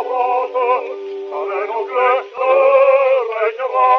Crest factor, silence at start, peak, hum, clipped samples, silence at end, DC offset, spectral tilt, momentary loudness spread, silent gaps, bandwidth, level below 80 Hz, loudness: 14 dB; 0 s; -2 dBFS; none; under 0.1%; 0 s; under 0.1%; 2.5 dB/octave; 12 LU; none; 5.8 kHz; -84 dBFS; -16 LUFS